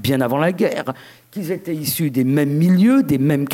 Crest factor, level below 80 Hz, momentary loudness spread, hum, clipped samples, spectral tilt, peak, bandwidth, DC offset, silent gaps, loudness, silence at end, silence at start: 12 dB; -56 dBFS; 15 LU; none; under 0.1%; -6.5 dB/octave; -4 dBFS; 17 kHz; under 0.1%; none; -18 LUFS; 0 s; 0 s